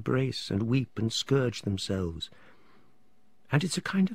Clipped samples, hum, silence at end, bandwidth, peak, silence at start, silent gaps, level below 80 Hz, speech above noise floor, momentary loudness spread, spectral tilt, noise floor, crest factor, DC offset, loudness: under 0.1%; none; 0 s; 15.5 kHz; -10 dBFS; 0 s; none; -56 dBFS; 40 dB; 6 LU; -5.5 dB/octave; -69 dBFS; 20 dB; 0.2%; -30 LUFS